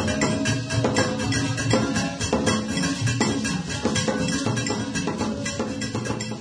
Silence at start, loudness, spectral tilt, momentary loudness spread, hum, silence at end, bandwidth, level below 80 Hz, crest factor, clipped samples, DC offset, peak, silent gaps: 0 s; -24 LUFS; -4.5 dB/octave; 5 LU; none; 0 s; 11 kHz; -44 dBFS; 18 dB; under 0.1%; under 0.1%; -6 dBFS; none